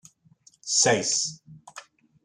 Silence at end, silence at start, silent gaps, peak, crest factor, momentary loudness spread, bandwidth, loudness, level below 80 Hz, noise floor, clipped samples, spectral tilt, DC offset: 0.45 s; 0.65 s; none; -8 dBFS; 20 dB; 25 LU; 12.5 kHz; -23 LUFS; -72 dBFS; -59 dBFS; under 0.1%; -1.5 dB/octave; under 0.1%